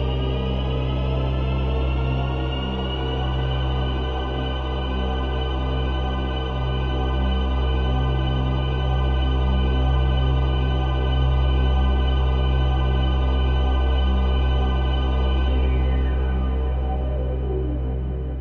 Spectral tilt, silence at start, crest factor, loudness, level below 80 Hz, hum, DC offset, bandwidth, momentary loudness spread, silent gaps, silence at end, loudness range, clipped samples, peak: -8.5 dB/octave; 0 s; 10 dB; -23 LUFS; -22 dBFS; none; 0.4%; 4.3 kHz; 4 LU; none; 0 s; 4 LU; under 0.1%; -10 dBFS